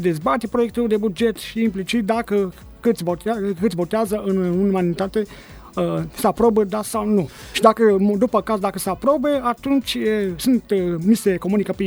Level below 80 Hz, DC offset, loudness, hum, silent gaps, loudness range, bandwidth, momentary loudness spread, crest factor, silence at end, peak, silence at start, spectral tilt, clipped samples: -46 dBFS; under 0.1%; -20 LUFS; none; none; 3 LU; over 20 kHz; 6 LU; 20 dB; 0 s; 0 dBFS; 0 s; -6 dB/octave; under 0.1%